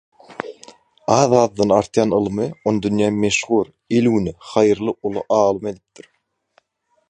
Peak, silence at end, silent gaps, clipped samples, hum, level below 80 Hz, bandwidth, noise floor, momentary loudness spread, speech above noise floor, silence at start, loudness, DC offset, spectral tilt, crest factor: 0 dBFS; 1.35 s; none; under 0.1%; none; -52 dBFS; 10 kHz; -67 dBFS; 14 LU; 49 dB; 0.3 s; -18 LUFS; under 0.1%; -5.5 dB/octave; 18 dB